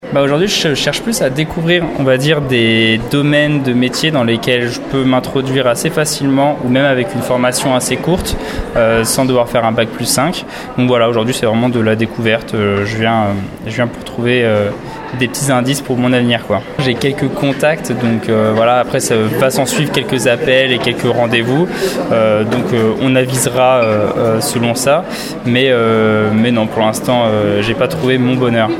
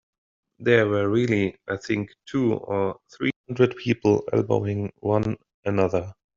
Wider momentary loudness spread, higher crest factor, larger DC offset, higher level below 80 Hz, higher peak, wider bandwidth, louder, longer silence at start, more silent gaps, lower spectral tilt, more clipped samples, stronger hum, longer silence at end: second, 5 LU vs 8 LU; second, 12 dB vs 20 dB; neither; first, -38 dBFS vs -58 dBFS; first, 0 dBFS vs -4 dBFS; first, 16.5 kHz vs 7.6 kHz; first, -13 LUFS vs -24 LUFS; second, 0 s vs 0.6 s; second, none vs 3.36-3.44 s, 5.54-5.63 s; about the same, -5 dB/octave vs -6 dB/octave; neither; neither; second, 0 s vs 0.25 s